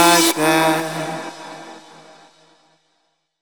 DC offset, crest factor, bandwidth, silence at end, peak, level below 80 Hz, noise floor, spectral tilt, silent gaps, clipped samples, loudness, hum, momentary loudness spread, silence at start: under 0.1%; 20 dB; over 20 kHz; 1.6 s; -2 dBFS; -72 dBFS; -68 dBFS; -2.5 dB/octave; none; under 0.1%; -17 LUFS; none; 24 LU; 0 s